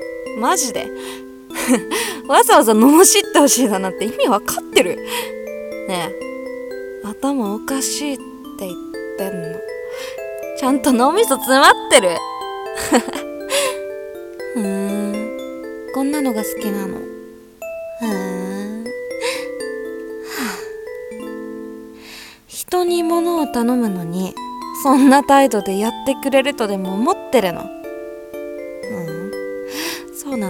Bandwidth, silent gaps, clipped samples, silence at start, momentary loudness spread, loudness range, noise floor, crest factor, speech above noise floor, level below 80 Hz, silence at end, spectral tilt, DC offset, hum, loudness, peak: 18 kHz; none; under 0.1%; 0 s; 19 LU; 12 LU; -38 dBFS; 18 dB; 23 dB; -54 dBFS; 0 s; -3 dB/octave; under 0.1%; none; -17 LUFS; 0 dBFS